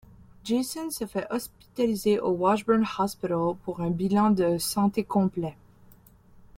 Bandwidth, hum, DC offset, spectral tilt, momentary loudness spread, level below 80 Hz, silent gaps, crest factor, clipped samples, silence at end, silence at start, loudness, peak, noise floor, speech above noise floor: 16.5 kHz; none; under 0.1%; -6 dB/octave; 10 LU; -58 dBFS; none; 18 dB; under 0.1%; 1.05 s; 0.45 s; -26 LUFS; -10 dBFS; -54 dBFS; 29 dB